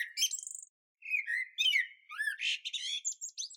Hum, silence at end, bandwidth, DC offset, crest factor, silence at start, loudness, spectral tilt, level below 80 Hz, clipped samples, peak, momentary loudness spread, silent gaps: none; 0 s; 18 kHz; under 0.1%; 18 dB; 0 s; -33 LUFS; 12.5 dB/octave; under -90 dBFS; under 0.1%; -18 dBFS; 11 LU; 0.69-0.95 s